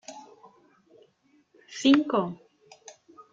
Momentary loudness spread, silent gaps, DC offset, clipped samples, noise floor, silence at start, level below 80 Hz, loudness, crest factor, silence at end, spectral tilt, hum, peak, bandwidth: 28 LU; none; under 0.1%; under 0.1%; -65 dBFS; 0.1 s; -74 dBFS; -24 LUFS; 24 dB; 1 s; -4.5 dB/octave; none; -6 dBFS; 7.8 kHz